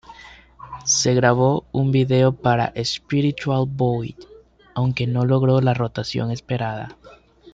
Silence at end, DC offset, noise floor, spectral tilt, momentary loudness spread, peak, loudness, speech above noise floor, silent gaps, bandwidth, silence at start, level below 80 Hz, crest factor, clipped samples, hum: 0.4 s; under 0.1%; -44 dBFS; -5 dB/octave; 11 LU; -4 dBFS; -20 LUFS; 25 dB; none; 7.8 kHz; 0.1 s; -50 dBFS; 18 dB; under 0.1%; none